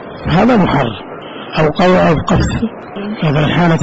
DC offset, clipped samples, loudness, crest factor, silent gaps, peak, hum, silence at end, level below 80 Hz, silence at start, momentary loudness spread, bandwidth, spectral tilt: under 0.1%; under 0.1%; -13 LUFS; 8 dB; none; -4 dBFS; none; 0 s; -30 dBFS; 0 s; 14 LU; 8 kHz; -7 dB/octave